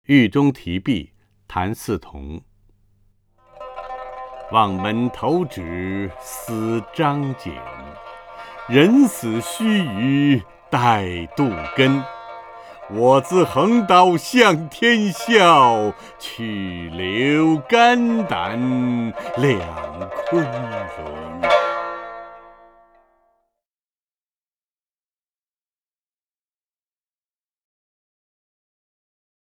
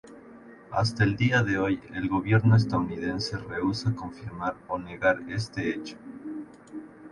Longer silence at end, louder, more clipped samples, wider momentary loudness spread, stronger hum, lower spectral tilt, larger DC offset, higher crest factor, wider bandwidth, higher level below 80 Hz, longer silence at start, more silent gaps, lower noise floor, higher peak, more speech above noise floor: first, 7.2 s vs 0 s; first, -18 LUFS vs -27 LUFS; neither; first, 21 LU vs 18 LU; neither; about the same, -5.5 dB/octave vs -6.5 dB/octave; neither; about the same, 20 dB vs 18 dB; first, 18.5 kHz vs 11 kHz; about the same, -50 dBFS vs -52 dBFS; about the same, 0.1 s vs 0.05 s; neither; first, under -90 dBFS vs -49 dBFS; first, 0 dBFS vs -8 dBFS; first, over 72 dB vs 22 dB